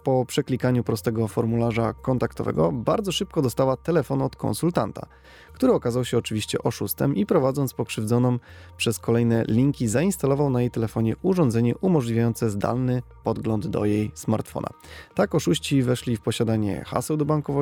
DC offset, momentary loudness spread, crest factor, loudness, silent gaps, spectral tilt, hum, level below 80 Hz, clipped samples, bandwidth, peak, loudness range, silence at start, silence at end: under 0.1%; 6 LU; 16 dB; -24 LUFS; none; -6.5 dB/octave; none; -50 dBFS; under 0.1%; 18 kHz; -6 dBFS; 3 LU; 0.05 s; 0 s